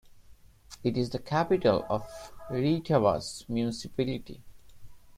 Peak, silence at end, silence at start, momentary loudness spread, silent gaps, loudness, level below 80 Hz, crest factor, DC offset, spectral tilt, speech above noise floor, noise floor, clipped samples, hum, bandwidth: -10 dBFS; 0 s; 0.1 s; 12 LU; none; -29 LUFS; -54 dBFS; 20 dB; under 0.1%; -6.5 dB/octave; 26 dB; -54 dBFS; under 0.1%; none; 16 kHz